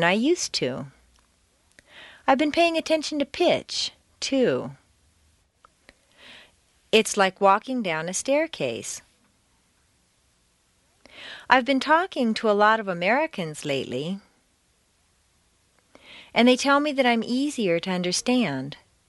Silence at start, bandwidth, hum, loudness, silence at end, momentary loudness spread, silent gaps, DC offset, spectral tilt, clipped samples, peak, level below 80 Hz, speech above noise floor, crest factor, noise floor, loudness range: 0 s; 11.5 kHz; none; -23 LUFS; 0.35 s; 13 LU; none; under 0.1%; -3.5 dB/octave; under 0.1%; -2 dBFS; -64 dBFS; 43 dB; 24 dB; -66 dBFS; 7 LU